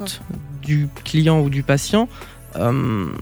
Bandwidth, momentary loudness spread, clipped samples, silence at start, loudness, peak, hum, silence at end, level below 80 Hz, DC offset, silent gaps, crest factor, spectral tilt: over 20 kHz; 15 LU; under 0.1%; 0 s; -20 LUFS; -2 dBFS; none; 0 s; -42 dBFS; under 0.1%; none; 18 dB; -6 dB/octave